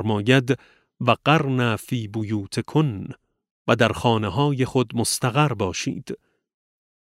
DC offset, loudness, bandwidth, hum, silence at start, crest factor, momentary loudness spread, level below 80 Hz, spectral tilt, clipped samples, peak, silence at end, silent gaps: under 0.1%; -22 LUFS; 16 kHz; none; 0 s; 20 dB; 11 LU; -54 dBFS; -5.5 dB/octave; under 0.1%; -2 dBFS; 0.85 s; 3.51-3.65 s